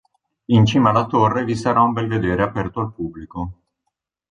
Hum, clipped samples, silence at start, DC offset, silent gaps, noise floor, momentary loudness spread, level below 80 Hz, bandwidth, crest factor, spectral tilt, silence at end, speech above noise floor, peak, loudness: none; under 0.1%; 0.5 s; under 0.1%; none; -77 dBFS; 15 LU; -44 dBFS; 9.8 kHz; 18 dB; -7 dB/octave; 0.75 s; 59 dB; -2 dBFS; -18 LUFS